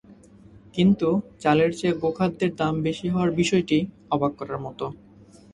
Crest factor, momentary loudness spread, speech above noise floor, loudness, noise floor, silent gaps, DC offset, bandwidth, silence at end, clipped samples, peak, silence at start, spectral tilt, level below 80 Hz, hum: 18 dB; 12 LU; 27 dB; -24 LUFS; -50 dBFS; none; under 0.1%; 11 kHz; 0.6 s; under 0.1%; -6 dBFS; 0.1 s; -6.5 dB/octave; -54 dBFS; none